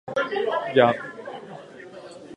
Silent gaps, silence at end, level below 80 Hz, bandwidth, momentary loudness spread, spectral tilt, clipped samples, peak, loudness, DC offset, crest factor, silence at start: none; 0 s; -68 dBFS; 10.5 kHz; 22 LU; -6 dB/octave; under 0.1%; -2 dBFS; -22 LUFS; under 0.1%; 24 dB; 0.05 s